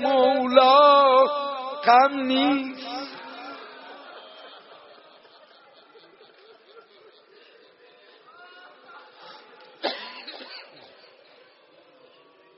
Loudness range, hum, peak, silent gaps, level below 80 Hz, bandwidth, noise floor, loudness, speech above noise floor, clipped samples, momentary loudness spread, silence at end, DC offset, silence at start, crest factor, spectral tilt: 25 LU; none; -2 dBFS; none; -78 dBFS; 6 kHz; -55 dBFS; -20 LUFS; 35 dB; under 0.1%; 28 LU; 1.95 s; under 0.1%; 0 s; 24 dB; 0 dB/octave